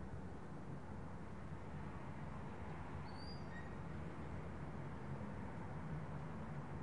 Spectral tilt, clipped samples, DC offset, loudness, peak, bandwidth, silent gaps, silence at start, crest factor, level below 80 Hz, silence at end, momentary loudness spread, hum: -7.5 dB/octave; under 0.1%; 0.2%; -50 LUFS; -36 dBFS; 11 kHz; none; 0 s; 12 dB; -60 dBFS; 0 s; 3 LU; none